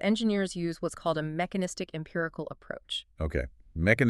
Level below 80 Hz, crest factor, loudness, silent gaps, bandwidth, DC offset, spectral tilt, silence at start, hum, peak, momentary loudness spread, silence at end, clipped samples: -46 dBFS; 22 dB; -32 LUFS; none; 12.5 kHz; under 0.1%; -5.5 dB/octave; 0 s; none; -8 dBFS; 11 LU; 0 s; under 0.1%